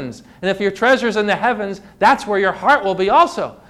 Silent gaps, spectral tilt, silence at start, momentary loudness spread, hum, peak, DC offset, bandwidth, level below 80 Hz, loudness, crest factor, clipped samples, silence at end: none; -4.5 dB/octave; 0 s; 10 LU; none; -4 dBFS; under 0.1%; 13.5 kHz; -52 dBFS; -16 LUFS; 14 dB; under 0.1%; 0.15 s